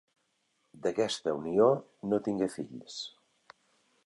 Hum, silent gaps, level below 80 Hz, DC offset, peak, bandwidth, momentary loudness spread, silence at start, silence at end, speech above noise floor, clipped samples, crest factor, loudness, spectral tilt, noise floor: none; none; -72 dBFS; under 0.1%; -12 dBFS; 11.5 kHz; 15 LU; 0.8 s; 0.95 s; 46 dB; under 0.1%; 20 dB; -31 LUFS; -5.5 dB/octave; -76 dBFS